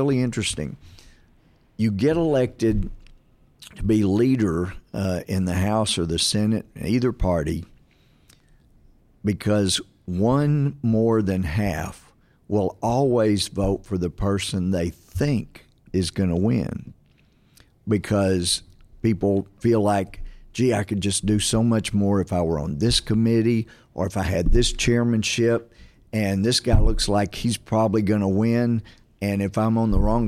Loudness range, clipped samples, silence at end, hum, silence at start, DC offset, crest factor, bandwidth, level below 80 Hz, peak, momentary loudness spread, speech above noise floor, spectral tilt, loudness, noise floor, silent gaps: 4 LU; under 0.1%; 0 s; none; 0 s; under 0.1%; 16 dB; 15 kHz; -32 dBFS; -6 dBFS; 8 LU; 37 dB; -5.5 dB/octave; -23 LUFS; -58 dBFS; none